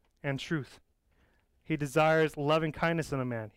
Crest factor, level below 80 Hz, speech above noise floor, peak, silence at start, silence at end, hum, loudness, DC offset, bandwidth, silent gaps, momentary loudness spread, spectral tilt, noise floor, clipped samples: 16 dB; -60 dBFS; 39 dB; -16 dBFS; 0.25 s; 0.05 s; none; -30 LUFS; under 0.1%; 16 kHz; none; 11 LU; -6 dB/octave; -69 dBFS; under 0.1%